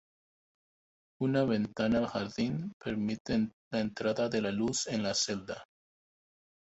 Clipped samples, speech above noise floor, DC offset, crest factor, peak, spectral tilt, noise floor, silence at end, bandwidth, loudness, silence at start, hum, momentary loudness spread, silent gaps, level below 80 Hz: under 0.1%; over 58 dB; under 0.1%; 18 dB; -16 dBFS; -4.5 dB/octave; under -90 dBFS; 1.1 s; 8.2 kHz; -32 LUFS; 1.2 s; none; 6 LU; 2.73-2.80 s, 3.20-3.25 s, 3.53-3.71 s; -62 dBFS